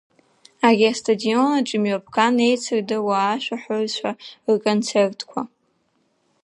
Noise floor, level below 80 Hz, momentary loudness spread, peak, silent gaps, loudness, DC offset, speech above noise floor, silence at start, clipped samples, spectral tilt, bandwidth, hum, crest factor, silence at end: -67 dBFS; -72 dBFS; 12 LU; -2 dBFS; none; -21 LUFS; under 0.1%; 47 dB; 0.6 s; under 0.1%; -4.5 dB/octave; 11 kHz; none; 20 dB; 0.95 s